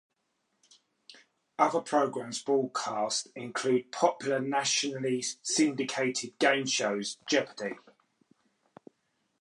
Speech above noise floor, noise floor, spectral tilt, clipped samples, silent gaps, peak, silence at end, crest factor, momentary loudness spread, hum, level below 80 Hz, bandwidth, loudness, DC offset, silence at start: 49 dB; -78 dBFS; -2.5 dB/octave; under 0.1%; none; -10 dBFS; 1.65 s; 22 dB; 8 LU; none; -84 dBFS; 11.5 kHz; -29 LUFS; under 0.1%; 1.1 s